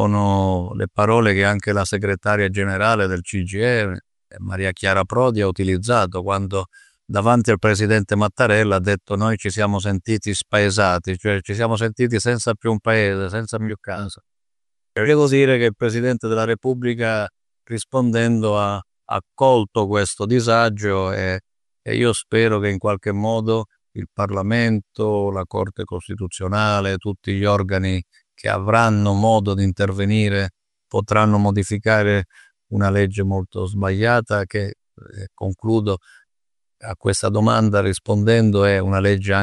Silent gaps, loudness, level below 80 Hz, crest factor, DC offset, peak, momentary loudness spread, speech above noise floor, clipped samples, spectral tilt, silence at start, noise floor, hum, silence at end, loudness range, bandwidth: none; -19 LUFS; -48 dBFS; 18 dB; under 0.1%; -2 dBFS; 11 LU; 71 dB; under 0.1%; -6 dB/octave; 0 s; -89 dBFS; none; 0 s; 3 LU; 11.5 kHz